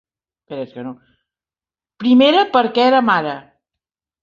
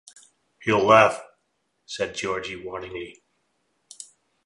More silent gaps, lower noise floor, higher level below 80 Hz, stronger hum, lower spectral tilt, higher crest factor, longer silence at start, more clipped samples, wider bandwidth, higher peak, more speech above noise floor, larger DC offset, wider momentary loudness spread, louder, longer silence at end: neither; first, under -90 dBFS vs -74 dBFS; about the same, -64 dBFS vs -60 dBFS; neither; first, -6 dB/octave vs -4.5 dB/octave; second, 16 dB vs 24 dB; about the same, 0.5 s vs 0.6 s; neither; second, 7 kHz vs 11.5 kHz; about the same, -2 dBFS vs -2 dBFS; first, over 75 dB vs 51 dB; neither; second, 21 LU vs 26 LU; first, -14 LUFS vs -22 LUFS; first, 0.85 s vs 0.45 s